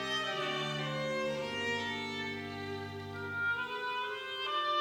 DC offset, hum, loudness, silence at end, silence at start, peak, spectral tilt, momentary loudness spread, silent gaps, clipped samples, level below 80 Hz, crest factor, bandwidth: under 0.1%; none; -36 LUFS; 0 s; 0 s; -20 dBFS; -4 dB/octave; 7 LU; none; under 0.1%; -70 dBFS; 16 dB; 17 kHz